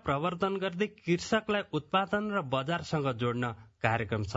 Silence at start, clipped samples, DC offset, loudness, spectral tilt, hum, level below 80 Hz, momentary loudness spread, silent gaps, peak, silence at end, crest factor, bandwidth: 0.05 s; under 0.1%; under 0.1%; -31 LUFS; -4.5 dB/octave; none; -62 dBFS; 4 LU; none; -10 dBFS; 0 s; 22 dB; 7.6 kHz